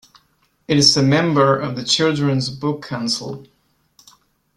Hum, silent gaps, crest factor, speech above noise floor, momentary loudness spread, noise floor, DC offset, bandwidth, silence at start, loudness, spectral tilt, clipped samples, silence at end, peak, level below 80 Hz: none; none; 18 dB; 45 dB; 12 LU; -62 dBFS; under 0.1%; 12 kHz; 0.7 s; -17 LUFS; -4.5 dB/octave; under 0.1%; 1.15 s; 0 dBFS; -54 dBFS